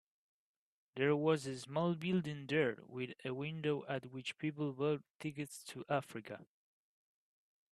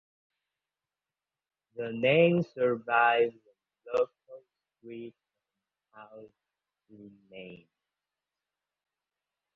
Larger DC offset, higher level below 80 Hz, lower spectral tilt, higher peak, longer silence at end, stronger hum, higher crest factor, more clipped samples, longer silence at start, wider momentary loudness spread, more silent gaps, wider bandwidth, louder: neither; about the same, -80 dBFS vs -76 dBFS; second, -6 dB/octave vs -8 dB/octave; second, -20 dBFS vs -10 dBFS; second, 1.3 s vs 2 s; second, none vs 50 Hz at -70 dBFS; about the same, 20 dB vs 22 dB; neither; second, 0.95 s vs 1.75 s; second, 12 LU vs 25 LU; first, 5.15-5.20 s vs none; first, 13 kHz vs 6.2 kHz; second, -39 LUFS vs -27 LUFS